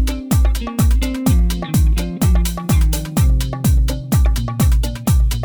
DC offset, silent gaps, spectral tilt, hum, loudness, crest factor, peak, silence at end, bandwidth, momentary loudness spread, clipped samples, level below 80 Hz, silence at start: under 0.1%; none; -6 dB/octave; none; -17 LUFS; 10 dB; -4 dBFS; 0 s; over 20 kHz; 2 LU; under 0.1%; -16 dBFS; 0 s